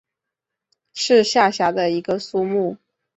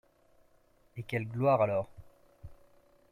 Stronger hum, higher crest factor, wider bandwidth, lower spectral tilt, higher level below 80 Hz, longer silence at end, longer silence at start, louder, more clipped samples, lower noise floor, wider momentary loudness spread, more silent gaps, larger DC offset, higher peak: neither; about the same, 18 dB vs 20 dB; second, 8.2 kHz vs 15.5 kHz; second, -4 dB/octave vs -8.5 dB/octave; about the same, -64 dBFS vs -62 dBFS; second, 0.4 s vs 0.6 s; about the same, 0.95 s vs 0.95 s; first, -19 LUFS vs -31 LUFS; neither; first, -84 dBFS vs -66 dBFS; second, 10 LU vs 19 LU; neither; neither; first, -2 dBFS vs -14 dBFS